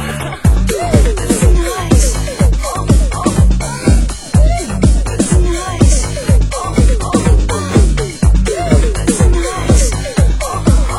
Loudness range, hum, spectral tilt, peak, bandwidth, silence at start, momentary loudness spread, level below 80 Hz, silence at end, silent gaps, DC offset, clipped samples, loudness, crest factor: 0 LU; none; -5.5 dB/octave; 0 dBFS; 16 kHz; 0 s; 3 LU; -14 dBFS; 0 s; none; under 0.1%; under 0.1%; -13 LUFS; 10 dB